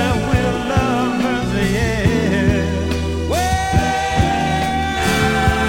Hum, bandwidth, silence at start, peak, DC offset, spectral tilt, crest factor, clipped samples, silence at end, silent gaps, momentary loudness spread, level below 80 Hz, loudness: none; 16.5 kHz; 0 s; -2 dBFS; under 0.1%; -5.5 dB/octave; 14 dB; under 0.1%; 0 s; none; 3 LU; -26 dBFS; -17 LUFS